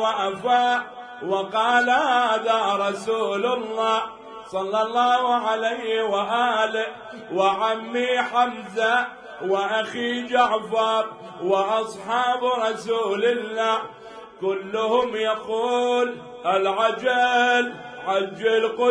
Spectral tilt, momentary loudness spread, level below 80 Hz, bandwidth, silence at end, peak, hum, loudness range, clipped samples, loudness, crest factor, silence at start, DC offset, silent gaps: -3.5 dB/octave; 10 LU; -68 dBFS; 10.5 kHz; 0 s; -8 dBFS; none; 2 LU; under 0.1%; -22 LUFS; 16 dB; 0 s; under 0.1%; none